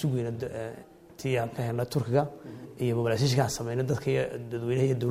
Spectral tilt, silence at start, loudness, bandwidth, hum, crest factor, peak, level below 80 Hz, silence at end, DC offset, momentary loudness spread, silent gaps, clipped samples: -6 dB/octave; 0 s; -29 LUFS; 15.5 kHz; none; 18 dB; -12 dBFS; -58 dBFS; 0 s; under 0.1%; 12 LU; none; under 0.1%